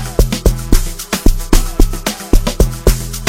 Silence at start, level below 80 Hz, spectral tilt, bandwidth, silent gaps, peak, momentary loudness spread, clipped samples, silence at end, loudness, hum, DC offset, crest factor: 0 s; -14 dBFS; -4.5 dB/octave; 17 kHz; none; 0 dBFS; 3 LU; 0.8%; 0 s; -16 LUFS; none; under 0.1%; 12 dB